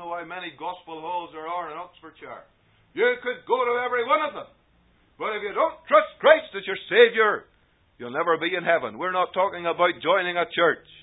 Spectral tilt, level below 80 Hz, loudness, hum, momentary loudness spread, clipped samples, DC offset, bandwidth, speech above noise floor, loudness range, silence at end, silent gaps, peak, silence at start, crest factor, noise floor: -8 dB/octave; -68 dBFS; -23 LUFS; none; 19 LU; under 0.1%; under 0.1%; 4 kHz; 38 dB; 7 LU; 0.25 s; none; -2 dBFS; 0 s; 24 dB; -62 dBFS